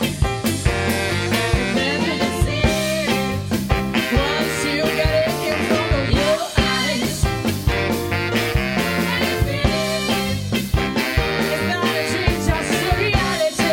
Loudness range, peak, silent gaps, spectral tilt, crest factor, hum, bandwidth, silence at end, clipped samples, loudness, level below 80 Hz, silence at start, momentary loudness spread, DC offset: 1 LU; -2 dBFS; none; -4.5 dB/octave; 18 dB; none; 17.5 kHz; 0 s; under 0.1%; -19 LUFS; -28 dBFS; 0 s; 3 LU; under 0.1%